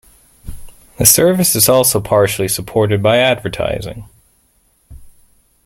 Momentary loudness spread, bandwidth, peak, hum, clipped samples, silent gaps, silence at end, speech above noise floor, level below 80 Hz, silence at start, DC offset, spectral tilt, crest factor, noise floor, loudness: 11 LU; 17 kHz; 0 dBFS; none; under 0.1%; none; 0.55 s; 44 dB; -40 dBFS; 0.45 s; under 0.1%; -3.5 dB/octave; 16 dB; -57 dBFS; -12 LUFS